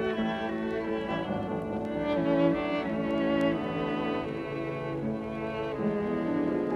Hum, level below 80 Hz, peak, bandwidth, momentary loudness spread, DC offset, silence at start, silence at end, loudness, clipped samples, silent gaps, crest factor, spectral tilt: none; -54 dBFS; -12 dBFS; 11 kHz; 7 LU; under 0.1%; 0 s; 0 s; -30 LUFS; under 0.1%; none; 16 dB; -8 dB/octave